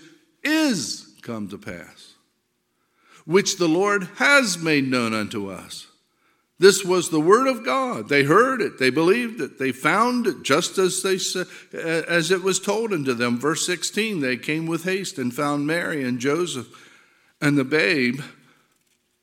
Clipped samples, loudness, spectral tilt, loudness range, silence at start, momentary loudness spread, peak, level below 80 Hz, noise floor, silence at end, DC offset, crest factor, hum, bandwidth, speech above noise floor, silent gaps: under 0.1%; -21 LUFS; -4 dB/octave; 5 LU; 0.45 s; 15 LU; 0 dBFS; -70 dBFS; -71 dBFS; 0.9 s; under 0.1%; 22 dB; none; 17 kHz; 50 dB; none